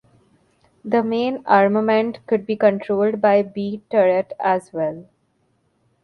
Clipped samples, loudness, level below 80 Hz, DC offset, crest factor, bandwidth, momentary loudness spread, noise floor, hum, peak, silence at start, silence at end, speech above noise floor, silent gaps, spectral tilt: under 0.1%; -19 LUFS; -66 dBFS; under 0.1%; 20 dB; 11 kHz; 10 LU; -65 dBFS; none; 0 dBFS; 0.85 s; 1 s; 47 dB; none; -7.5 dB/octave